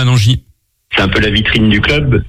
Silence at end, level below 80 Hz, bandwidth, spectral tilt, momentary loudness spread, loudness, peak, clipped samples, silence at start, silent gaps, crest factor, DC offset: 0 s; -26 dBFS; 13.5 kHz; -5.5 dB/octave; 5 LU; -11 LUFS; 0 dBFS; under 0.1%; 0 s; none; 12 dB; under 0.1%